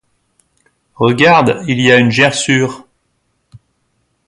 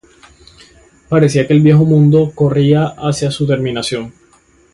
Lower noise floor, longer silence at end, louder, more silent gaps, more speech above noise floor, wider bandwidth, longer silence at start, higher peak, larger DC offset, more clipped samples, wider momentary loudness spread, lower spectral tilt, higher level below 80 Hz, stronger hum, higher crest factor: first, -64 dBFS vs -50 dBFS; first, 1.5 s vs 0.65 s; about the same, -11 LUFS vs -12 LUFS; neither; first, 53 dB vs 39 dB; about the same, 11.5 kHz vs 11.5 kHz; about the same, 1 s vs 1.1 s; about the same, 0 dBFS vs 0 dBFS; neither; neither; about the same, 8 LU vs 10 LU; second, -4.5 dB/octave vs -7 dB/octave; second, -52 dBFS vs -46 dBFS; neither; about the same, 14 dB vs 12 dB